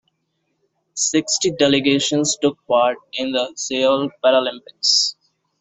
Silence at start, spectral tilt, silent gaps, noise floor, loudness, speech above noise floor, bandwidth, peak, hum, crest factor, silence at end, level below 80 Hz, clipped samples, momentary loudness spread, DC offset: 0.95 s; -2.5 dB/octave; none; -71 dBFS; -18 LUFS; 53 dB; 8.4 kHz; -2 dBFS; none; 18 dB; 0.5 s; -62 dBFS; under 0.1%; 7 LU; under 0.1%